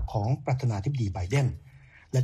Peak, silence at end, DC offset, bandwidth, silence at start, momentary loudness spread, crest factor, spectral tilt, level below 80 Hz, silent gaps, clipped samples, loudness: -14 dBFS; 0 s; under 0.1%; 10 kHz; 0 s; 4 LU; 14 dB; -7 dB/octave; -44 dBFS; none; under 0.1%; -29 LUFS